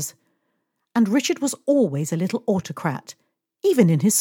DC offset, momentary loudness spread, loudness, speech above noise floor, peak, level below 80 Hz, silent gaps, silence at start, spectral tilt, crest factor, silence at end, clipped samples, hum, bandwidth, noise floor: under 0.1%; 10 LU; -21 LUFS; 54 dB; -4 dBFS; -72 dBFS; none; 0 s; -5.5 dB/octave; 18 dB; 0 s; under 0.1%; none; 18.5 kHz; -74 dBFS